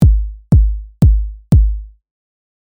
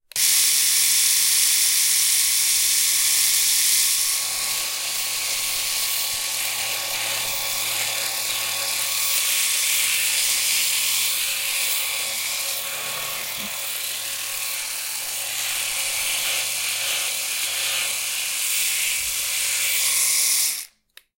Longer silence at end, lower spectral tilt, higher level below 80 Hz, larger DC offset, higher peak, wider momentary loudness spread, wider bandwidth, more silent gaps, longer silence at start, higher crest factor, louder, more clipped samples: first, 0.9 s vs 0.5 s; first, -10 dB/octave vs 3 dB/octave; first, -16 dBFS vs -62 dBFS; neither; about the same, -2 dBFS vs -4 dBFS; second, 6 LU vs 9 LU; second, 1.8 kHz vs 16.5 kHz; neither; second, 0 s vs 0.15 s; second, 12 dB vs 20 dB; first, -15 LUFS vs -19 LUFS; neither